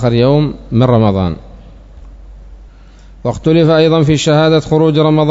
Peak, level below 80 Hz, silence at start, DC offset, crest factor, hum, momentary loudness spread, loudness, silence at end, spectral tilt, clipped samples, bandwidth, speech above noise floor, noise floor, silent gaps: 0 dBFS; -34 dBFS; 0 s; under 0.1%; 12 dB; none; 9 LU; -11 LUFS; 0 s; -7 dB/octave; 0.2%; 7.8 kHz; 27 dB; -37 dBFS; none